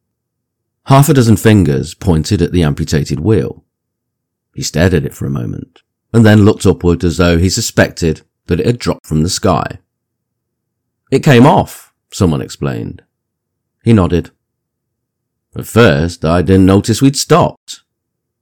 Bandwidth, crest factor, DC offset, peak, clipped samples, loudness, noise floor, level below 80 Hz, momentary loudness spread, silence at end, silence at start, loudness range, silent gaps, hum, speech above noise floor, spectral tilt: 18.5 kHz; 12 dB; under 0.1%; 0 dBFS; 1%; -12 LUFS; -74 dBFS; -32 dBFS; 14 LU; 0.65 s; 0.85 s; 5 LU; 9.00-9.04 s, 17.57-17.67 s; none; 63 dB; -6 dB/octave